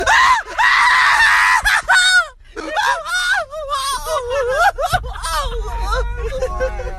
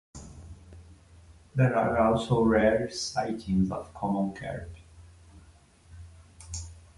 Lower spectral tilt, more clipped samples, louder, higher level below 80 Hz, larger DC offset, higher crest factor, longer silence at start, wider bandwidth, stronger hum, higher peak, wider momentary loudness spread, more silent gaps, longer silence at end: second, -1.5 dB/octave vs -6 dB/octave; neither; first, -15 LUFS vs -27 LUFS; first, -28 dBFS vs -48 dBFS; neither; second, 12 dB vs 18 dB; second, 0 s vs 0.15 s; first, 14 kHz vs 11.5 kHz; neither; first, -4 dBFS vs -10 dBFS; second, 13 LU vs 23 LU; neither; second, 0 s vs 0.2 s